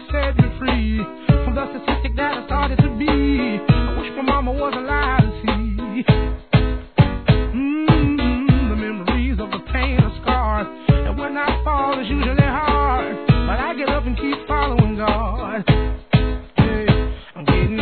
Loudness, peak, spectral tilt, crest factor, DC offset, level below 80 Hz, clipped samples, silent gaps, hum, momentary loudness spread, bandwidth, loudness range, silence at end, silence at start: -19 LUFS; 0 dBFS; -10.5 dB/octave; 18 dB; 0.3%; -24 dBFS; under 0.1%; none; none; 6 LU; 4.5 kHz; 1 LU; 0 s; 0 s